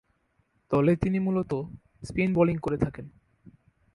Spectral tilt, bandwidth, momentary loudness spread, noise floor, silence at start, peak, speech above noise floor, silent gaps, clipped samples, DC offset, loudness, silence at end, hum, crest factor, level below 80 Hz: -9 dB/octave; 11 kHz; 15 LU; -71 dBFS; 0.7 s; -10 dBFS; 45 dB; none; under 0.1%; under 0.1%; -27 LUFS; 0.85 s; none; 18 dB; -50 dBFS